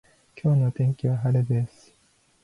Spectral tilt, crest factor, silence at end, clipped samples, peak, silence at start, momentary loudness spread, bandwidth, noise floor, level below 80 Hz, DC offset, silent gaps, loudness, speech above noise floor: -10 dB/octave; 14 dB; 0.75 s; under 0.1%; -12 dBFS; 0.35 s; 6 LU; 10.5 kHz; -63 dBFS; -60 dBFS; under 0.1%; none; -24 LUFS; 41 dB